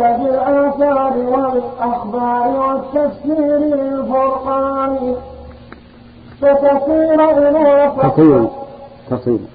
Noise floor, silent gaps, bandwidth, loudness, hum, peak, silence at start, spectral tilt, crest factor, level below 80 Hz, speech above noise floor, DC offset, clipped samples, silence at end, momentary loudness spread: -39 dBFS; none; 4.8 kHz; -14 LUFS; none; 0 dBFS; 0 s; -12 dB/octave; 14 dB; -44 dBFS; 27 dB; under 0.1%; under 0.1%; 0.05 s; 9 LU